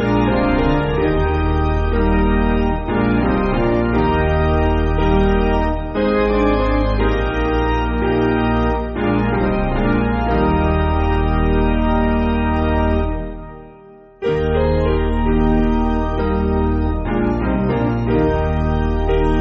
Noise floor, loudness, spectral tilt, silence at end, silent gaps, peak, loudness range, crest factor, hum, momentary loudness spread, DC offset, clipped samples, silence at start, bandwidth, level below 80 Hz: -42 dBFS; -18 LUFS; -6.5 dB/octave; 0 s; none; -4 dBFS; 2 LU; 12 dB; none; 3 LU; under 0.1%; under 0.1%; 0 s; 6.6 kHz; -22 dBFS